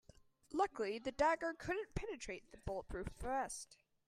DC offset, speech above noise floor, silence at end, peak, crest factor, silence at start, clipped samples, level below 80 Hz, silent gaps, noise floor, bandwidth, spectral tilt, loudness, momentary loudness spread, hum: under 0.1%; 24 dB; 0.35 s; -22 dBFS; 20 dB; 0.5 s; under 0.1%; -56 dBFS; none; -66 dBFS; 14.5 kHz; -4.5 dB/octave; -42 LUFS; 13 LU; none